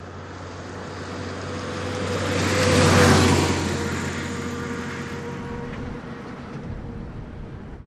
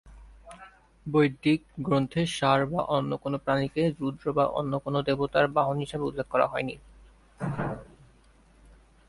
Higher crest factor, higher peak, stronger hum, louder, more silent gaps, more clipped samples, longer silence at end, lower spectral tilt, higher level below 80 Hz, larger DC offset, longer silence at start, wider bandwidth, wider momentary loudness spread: about the same, 22 dB vs 20 dB; first, -2 dBFS vs -8 dBFS; neither; first, -23 LUFS vs -27 LUFS; neither; neither; second, 0 s vs 1.25 s; second, -5 dB/octave vs -6.5 dB/octave; first, -44 dBFS vs -54 dBFS; neither; about the same, 0 s vs 0.05 s; first, 14.5 kHz vs 11.5 kHz; first, 20 LU vs 11 LU